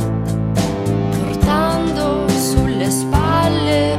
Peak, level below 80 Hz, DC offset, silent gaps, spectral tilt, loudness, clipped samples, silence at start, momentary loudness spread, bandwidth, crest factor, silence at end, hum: -2 dBFS; -28 dBFS; under 0.1%; none; -5.5 dB/octave; -17 LUFS; under 0.1%; 0 s; 4 LU; 16 kHz; 14 dB; 0 s; none